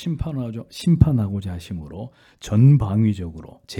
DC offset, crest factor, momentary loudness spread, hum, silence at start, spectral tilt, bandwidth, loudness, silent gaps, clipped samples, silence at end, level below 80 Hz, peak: under 0.1%; 20 dB; 21 LU; none; 0 s; -8 dB/octave; 11.5 kHz; -20 LUFS; none; under 0.1%; 0 s; -38 dBFS; 0 dBFS